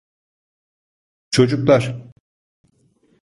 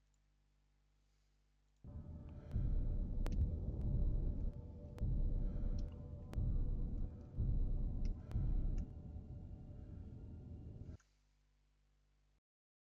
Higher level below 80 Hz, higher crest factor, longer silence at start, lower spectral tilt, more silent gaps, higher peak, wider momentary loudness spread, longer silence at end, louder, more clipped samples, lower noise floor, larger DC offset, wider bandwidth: second, -54 dBFS vs -44 dBFS; first, 20 dB vs 14 dB; second, 1.3 s vs 1.85 s; second, -6 dB/octave vs -10.5 dB/octave; neither; first, -2 dBFS vs -28 dBFS; about the same, 14 LU vs 13 LU; second, 1.25 s vs 2.05 s; first, -17 LUFS vs -45 LUFS; neither; second, -60 dBFS vs -76 dBFS; neither; first, 11.5 kHz vs 5.8 kHz